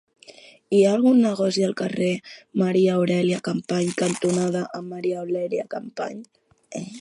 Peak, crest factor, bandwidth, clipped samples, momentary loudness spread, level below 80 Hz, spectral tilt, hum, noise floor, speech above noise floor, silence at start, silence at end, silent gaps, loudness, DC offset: -6 dBFS; 16 dB; 11.5 kHz; under 0.1%; 14 LU; -70 dBFS; -6 dB/octave; none; -48 dBFS; 26 dB; 0.3 s; 0 s; none; -23 LUFS; under 0.1%